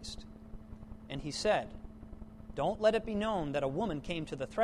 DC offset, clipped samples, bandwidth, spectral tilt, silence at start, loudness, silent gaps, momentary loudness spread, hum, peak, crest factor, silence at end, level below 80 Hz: under 0.1%; under 0.1%; 12 kHz; -5 dB/octave; 0 s; -34 LUFS; none; 21 LU; none; -16 dBFS; 20 dB; 0 s; -52 dBFS